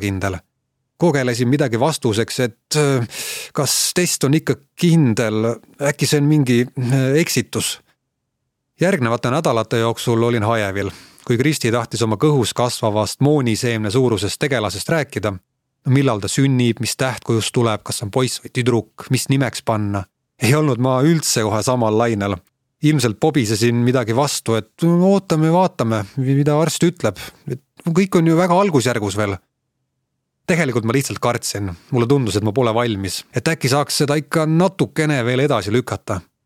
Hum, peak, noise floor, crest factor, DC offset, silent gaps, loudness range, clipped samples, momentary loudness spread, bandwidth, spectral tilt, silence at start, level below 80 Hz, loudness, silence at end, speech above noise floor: none; -2 dBFS; -75 dBFS; 16 dB; under 0.1%; none; 3 LU; under 0.1%; 8 LU; 16.5 kHz; -5 dB/octave; 0 s; -54 dBFS; -18 LUFS; 0.25 s; 57 dB